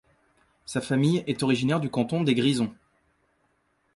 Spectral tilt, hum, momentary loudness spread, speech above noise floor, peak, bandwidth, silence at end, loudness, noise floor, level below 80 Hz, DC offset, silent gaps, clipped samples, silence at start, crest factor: -6 dB/octave; none; 9 LU; 45 dB; -10 dBFS; 11.5 kHz; 1.25 s; -25 LUFS; -70 dBFS; -64 dBFS; under 0.1%; none; under 0.1%; 0.7 s; 18 dB